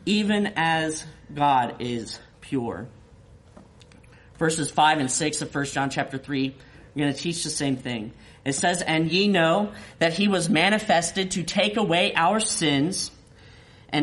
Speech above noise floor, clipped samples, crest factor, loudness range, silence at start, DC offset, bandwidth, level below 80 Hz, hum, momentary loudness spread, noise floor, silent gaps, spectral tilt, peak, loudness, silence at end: 27 dB; under 0.1%; 18 dB; 6 LU; 0 s; under 0.1%; 11.5 kHz; -56 dBFS; none; 12 LU; -51 dBFS; none; -3.5 dB/octave; -6 dBFS; -24 LUFS; 0 s